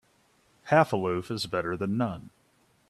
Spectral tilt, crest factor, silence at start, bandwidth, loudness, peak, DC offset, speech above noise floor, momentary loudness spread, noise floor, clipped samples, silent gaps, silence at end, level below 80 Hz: -6 dB/octave; 22 dB; 0.65 s; 13.5 kHz; -28 LUFS; -6 dBFS; under 0.1%; 39 dB; 8 LU; -66 dBFS; under 0.1%; none; 0.6 s; -64 dBFS